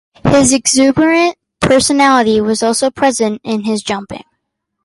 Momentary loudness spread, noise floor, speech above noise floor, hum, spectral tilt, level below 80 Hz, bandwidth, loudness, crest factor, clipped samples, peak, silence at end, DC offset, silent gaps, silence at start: 9 LU; -72 dBFS; 60 dB; none; -3.5 dB/octave; -40 dBFS; 11.5 kHz; -12 LUFS; 12 dB; under 0.1%; 0 dBFS; 0.65 s; under 0.1%; none; 0.25 s